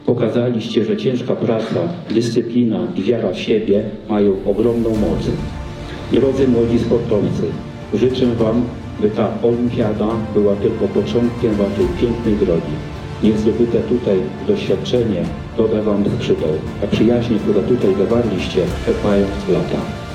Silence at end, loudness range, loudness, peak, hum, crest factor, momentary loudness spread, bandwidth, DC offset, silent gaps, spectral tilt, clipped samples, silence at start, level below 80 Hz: 0 s; 1 LU; -17 LUFS; -2 dBFS; none; 16 dB; 6 LU; 11 kHz; under 0.1%; none; -7.5 dB/octave; under 0.1%; 0 s; -34 dBFS